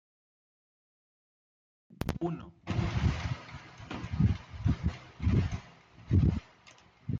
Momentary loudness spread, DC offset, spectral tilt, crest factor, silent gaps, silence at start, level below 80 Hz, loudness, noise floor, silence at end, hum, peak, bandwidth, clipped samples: 14 LU; under 0.1%; -7.5 dB/octave; 20 dB; none; 2 s; -42 dBFS; -33 LUFS; -59 dBFS; 0 s; none; -14 dBFS; 12.5 kHz; under 0.1%